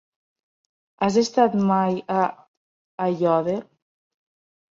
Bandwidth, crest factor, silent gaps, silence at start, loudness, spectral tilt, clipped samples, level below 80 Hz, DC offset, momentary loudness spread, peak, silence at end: 7.6 kHz; 20 dB; 2.48-2.98 s; 1 s; -22 LUFS; -6.5 dB/octave; under 0.1%; -66 dBFS; under 0.1%; 9 LU; -4 dBFS; 1.1 s